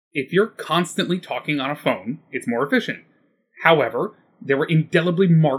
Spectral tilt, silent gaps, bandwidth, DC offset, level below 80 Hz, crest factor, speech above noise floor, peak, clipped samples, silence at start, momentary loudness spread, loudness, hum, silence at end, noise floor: -6.5 dB/octave; none; 14 kHz; under 0.1%; -72 dBFS; 20 dB; 38 dB; 0 dBFS; under 0.1%; 0.15 s; 12 LU; -21 LUFS; none; 0 s; -58 dBFS